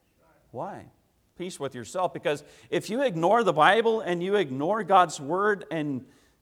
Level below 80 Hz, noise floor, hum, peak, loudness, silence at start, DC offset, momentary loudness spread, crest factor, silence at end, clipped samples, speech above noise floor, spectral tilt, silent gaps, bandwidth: -70 dBFS; -63 dBFS; none; -4 dBFS; -25 LUFS; 0.55 s; under 0.1%; 18 LU; 22 dB; 0.4 s; under 0.1%; 38 dB; -5 dB/octave; none; 15.5 kHz